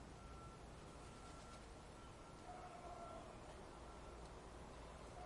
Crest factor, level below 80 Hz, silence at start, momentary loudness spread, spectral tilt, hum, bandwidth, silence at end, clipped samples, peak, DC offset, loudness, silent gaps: 14 dB; -62 dBFS; 0 s; 3 LU; -5 dB/octave; none; 11.5 kHz; 0 s; under 0.1%; -42 dBFS; under 0.1%; -57 LUFS; none